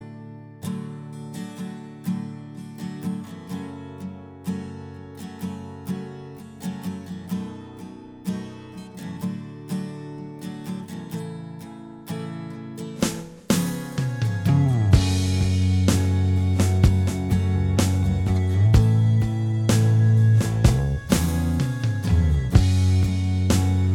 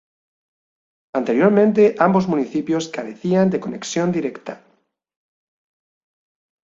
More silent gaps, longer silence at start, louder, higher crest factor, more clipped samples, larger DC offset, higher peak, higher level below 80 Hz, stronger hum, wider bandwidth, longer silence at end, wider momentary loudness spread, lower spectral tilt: neither; second, 0 s vs 1.15 s; second, -23 LUFS vs -19 LUFS; about the same, 20 dB vs 20 dB; neither; neither; about the same, -2 dBFS vs -2 dBFS; first, -34 dBFS vs -62 dBFS; neither; first, 16.5 kHz vs 7.8 kHz; second, 0 s vs 2.1 s; first, 18 LU vs 13 LU; about the same, -6.5 dB/octave vs -6.5 dB/octave